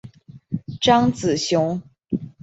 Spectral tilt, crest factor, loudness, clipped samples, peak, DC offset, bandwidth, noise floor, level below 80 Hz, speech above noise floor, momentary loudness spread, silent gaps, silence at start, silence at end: -5 dB/octave; 20 dB; -21 LUFS; under 0.1%; -2 dBFS; under 0.1%; 8.2 kHz; -42 dBFS; -52 dBFS; 23 dB; 15 LU; none; 0.05 s; 0.15 s